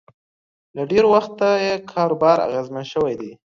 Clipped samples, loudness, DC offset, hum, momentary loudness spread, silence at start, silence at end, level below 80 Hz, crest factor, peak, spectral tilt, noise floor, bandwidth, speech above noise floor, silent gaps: under 0.1%; -19 LUFS; under 0.1%; none; 12 LU; 0.75 s; 0.25 s; -58 dBFS; 18 dB; -2 dBFS; -6 dB/octave; under -90 dBFS; 7.4 kHz; over 71 dB; none